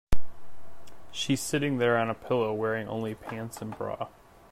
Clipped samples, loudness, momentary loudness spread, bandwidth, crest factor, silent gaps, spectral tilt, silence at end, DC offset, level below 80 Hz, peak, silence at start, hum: under 0.1%; -30 LUFS; 12 LU; 14.5 kHz; 16 dB; none; -5 dB/octave; 0.45 s; under 0.1%; -42 dBFS; -10 dBFS; 0.1 s; none